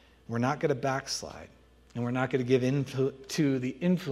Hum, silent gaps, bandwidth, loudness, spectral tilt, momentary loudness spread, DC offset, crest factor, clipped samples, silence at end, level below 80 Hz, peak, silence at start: none; none; 14.5 kHz; -30 LUFS; -6 dB/octave; 10 LU; under 0.1%; 18 dB; under 0.1%; 0 s; -62 dBFS; -12 dBFS; 0.3 s